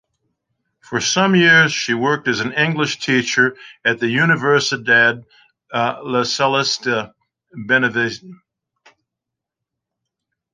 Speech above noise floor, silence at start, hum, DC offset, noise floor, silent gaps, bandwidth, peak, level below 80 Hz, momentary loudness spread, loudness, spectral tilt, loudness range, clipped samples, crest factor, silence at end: 66 dB; 0.9 s; none; under 0.1%; -83 dBFS; none; 10 kHz; -2 dBFS; -62 dBFS; 11 LU; -16 LUFS; -4 dB/octave; 7 LU; under 0.1%; 18 dB; 2.2 s